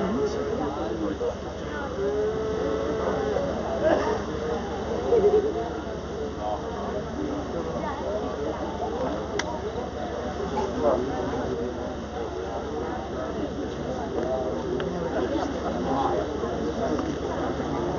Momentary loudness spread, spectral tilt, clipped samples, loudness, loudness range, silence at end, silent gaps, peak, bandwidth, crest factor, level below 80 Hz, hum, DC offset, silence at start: 7 LU; -5.5 dB/octave; under 0.1%; -28 LUFS; 5 LU; 0 s; none; -8 dBFS; 7.4 kHz; 20 dB; -42 dBFS; none; under 0.1%; 0 s